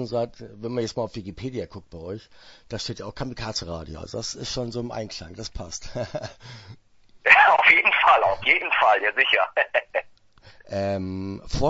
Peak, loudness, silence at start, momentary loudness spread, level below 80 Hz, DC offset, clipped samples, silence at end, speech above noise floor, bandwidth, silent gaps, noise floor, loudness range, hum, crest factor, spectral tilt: 0 dBFS; -21 LUFS; 0 s; 21 LU; -46 dBFS; under 0.1%; under 0.1%; 0 s; 27 dB; 8 kHz; none; -52 dBFS; 15 LU; none; 24 dB; -3.5 dB/octave